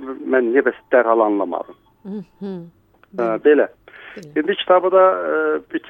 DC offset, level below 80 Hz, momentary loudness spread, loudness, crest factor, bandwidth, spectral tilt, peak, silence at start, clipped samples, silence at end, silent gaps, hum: under 0.1%; -64 dBFS; 19 LU; -17 LUFS; 18 dB; 6.6 kHz; -7 dB/octave; -2 dBFS; 0 s; under 0.1%; 0 s; none; none